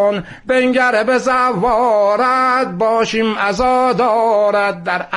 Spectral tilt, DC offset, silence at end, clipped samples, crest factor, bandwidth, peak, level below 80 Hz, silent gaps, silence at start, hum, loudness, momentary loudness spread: -5 dB/octave; under 0.1%; 0 s; under 0.1%; 12 dB; 11.5 kHz; -4 dBFS; -44 dBFS; none; 0 s; none; -14 LUFS; 4 LU